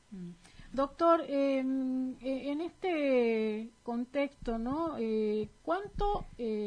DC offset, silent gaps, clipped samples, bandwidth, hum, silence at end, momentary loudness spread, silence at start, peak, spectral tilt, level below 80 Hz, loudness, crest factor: under 0.1%; none; under 0.1%; 10 kHz; none; 0 s; 10 LU; 0.1 s; -16 dBFS; -7 dB/octave; -50 dBFS; -33 LUFS; 18 dB